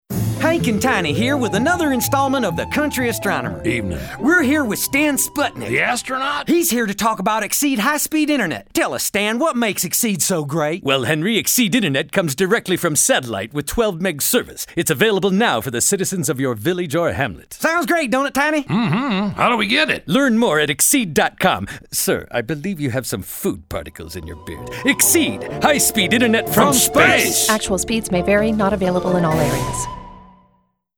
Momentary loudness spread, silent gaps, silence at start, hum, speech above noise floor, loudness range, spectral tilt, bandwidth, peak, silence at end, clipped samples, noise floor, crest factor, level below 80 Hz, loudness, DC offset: 9 LU; none; 0.1 s; none; 44 dB; 4 LU; -3.5 dB/octave; over 20 kHz; 0 dBFS; 0.75 s; under 0.1%; -62 dBFS; 18 dB; -42 dBFS; -17 LUFS; under 0.1%